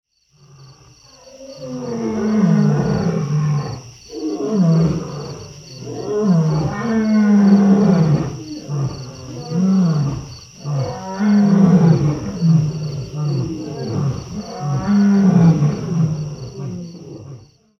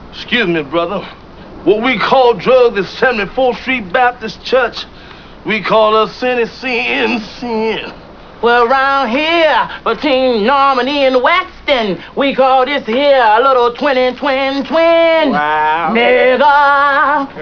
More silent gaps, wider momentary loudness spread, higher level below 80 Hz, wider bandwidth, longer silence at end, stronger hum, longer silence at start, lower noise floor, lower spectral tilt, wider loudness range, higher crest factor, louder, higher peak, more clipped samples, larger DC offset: neither; first, 19 LU vs 8 LU; about the same, -44 dBFS vs -42 dBFS; first, 6.6 kHz vs 5.4 kHz; first, 0.4 s vs 0 s; neither; first, 0.6 s vs 0 s; first, -51 dBFS vs -34 dBFS; first, -8 dB/octave vs -5.5 dB/octave; about the same, 4 LU vs 3 LU; about the same, 16 dB vs 12 dB; second, -17 LUFS vs -12 LUFS; about the same, -2 dBFS vs 0 dBFS; neither; second, under 0.1% vs 0.4%